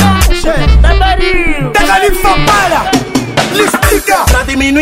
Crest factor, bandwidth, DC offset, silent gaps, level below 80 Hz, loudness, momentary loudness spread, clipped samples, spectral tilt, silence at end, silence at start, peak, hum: 8 dB; 16.5 kHz; under 0.1%; none; -14 dBFS; -9 LUFS; 4 LU; under 0.1%; -4.5 dB/octave; 0 s; 0 s; 0 dBFS; none